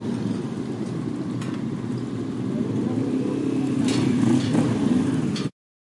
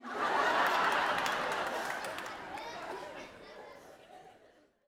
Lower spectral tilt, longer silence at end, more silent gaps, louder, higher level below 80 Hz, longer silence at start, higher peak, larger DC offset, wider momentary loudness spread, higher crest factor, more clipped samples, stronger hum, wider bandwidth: first, -7 dB/octave vs -2 dB/octave; second, 0.4 s vs 0.55 s; neither; first, -25 LUFS vs -33 LUFS; first, -58 dBFS vs -70 dBFS; about the same, 0 s vs 0 s; first, -8 dBFS vs -14 dBFS; neither; second, 8 LU vs 22 LU; second, 16 dB vs 22 dB; neither; neither; second, 11.5 kHz vs over 20 kHz